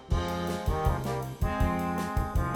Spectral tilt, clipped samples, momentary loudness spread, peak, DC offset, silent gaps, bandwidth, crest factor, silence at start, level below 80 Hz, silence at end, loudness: -6.5 dB/octave; under 0.1%; 3 LU; -14 dBFS; under 0.1%; none; 18 kHz; 16 dB; 0 s; -34 dBFS; 0 s; -30 LUFS